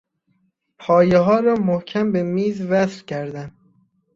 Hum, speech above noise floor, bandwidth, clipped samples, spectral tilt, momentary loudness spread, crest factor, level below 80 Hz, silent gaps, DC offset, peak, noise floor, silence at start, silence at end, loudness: none; 48 dB; 7.6 kHz; under 0.1%; -7.5 dB/octave; 16 LU; 18 dB; -56 dBFS; none; under 0.1%; -2 dBFS; -66 dBFS; 0.8 s; 0.65 s; -19 LUFS